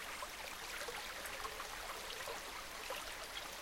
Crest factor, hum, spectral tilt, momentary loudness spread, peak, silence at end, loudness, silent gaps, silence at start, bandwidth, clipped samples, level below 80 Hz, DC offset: 18 dB; none; -0.5 dB/octave; 2 LU; -28 dBFS; 0 s; -45 LUFS; none; 0 s; 16.5 kHz; under 0.1%; -62 dBFS; under 0.1%